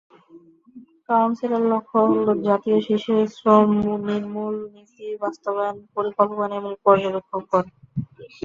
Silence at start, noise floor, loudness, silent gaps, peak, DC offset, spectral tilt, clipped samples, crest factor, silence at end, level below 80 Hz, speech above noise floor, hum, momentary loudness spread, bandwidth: 0.35 s; -50 dBFS; -21 LUFS; none; -2 dBFS; under 0.1%; -8 dB/octave; under 0.1%; 20 dB; 0.15 s; -60 dBFS; 29 dB; none; 14 LU; 7.2 kHz